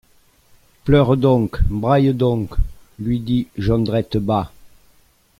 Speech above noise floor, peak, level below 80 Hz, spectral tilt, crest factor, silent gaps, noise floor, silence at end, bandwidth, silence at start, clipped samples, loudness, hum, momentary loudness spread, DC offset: 38 dB; -2 dBFS; -28 dBFS; -9 dB/octave; 16 dB; none; -55 dBFS; 0.75 s; 14.5 kHz; 0.85 s; under 0.1%; -19 LUFS; none; 13 LU; under 0.1%